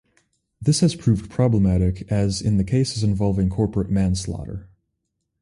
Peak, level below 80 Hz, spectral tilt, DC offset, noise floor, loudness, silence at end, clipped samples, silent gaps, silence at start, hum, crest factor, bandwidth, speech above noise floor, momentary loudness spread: -6 dBFS; -36 dBFS; -6.5 dB/octave; under 0.1%; -77 dBFS; -21 LUFS; 0.75 s; under 0.1%; none; 0.6 s; none; 16 dB; 11.5 kHz; 57 dB; 8 LU